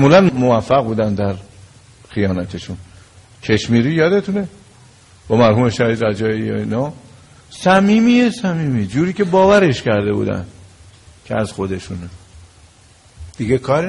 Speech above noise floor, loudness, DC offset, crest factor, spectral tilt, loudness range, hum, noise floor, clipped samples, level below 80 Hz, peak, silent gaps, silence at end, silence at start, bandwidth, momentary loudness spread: 32 dB; -16 LUFS; under 0.1%; 16 dB; -6.5 dB/octave; 8 LU; none; -47 dBFS; under 0.1%; -46 dBFS; 0 dBFS; none; 0 s; 0 s; 11.5 kHz; 16 LU